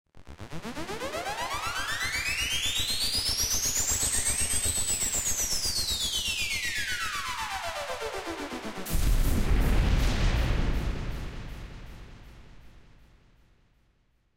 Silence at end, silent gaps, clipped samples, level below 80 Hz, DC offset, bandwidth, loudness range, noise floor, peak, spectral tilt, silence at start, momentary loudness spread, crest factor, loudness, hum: 1.3 s; none; under 0.1%; -34 dBFS; under 0.1%; 16 kHz; 9 LU; -68 dBFS; -14 dBFS; -2 dB/octave; 0.15 s; 14 LU; 16 dB; -28 LUFS; none